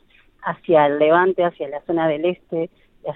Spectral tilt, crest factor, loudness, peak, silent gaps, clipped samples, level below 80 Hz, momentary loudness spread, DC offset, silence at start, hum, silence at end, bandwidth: -10 dB/octave; 16 dB; -19 LUFS; -2 dBFS; none; under 0.1%; -60 dBFS; 15 LU; under 0.1%; 0.4 s; none; 0 s; 4.1 kHz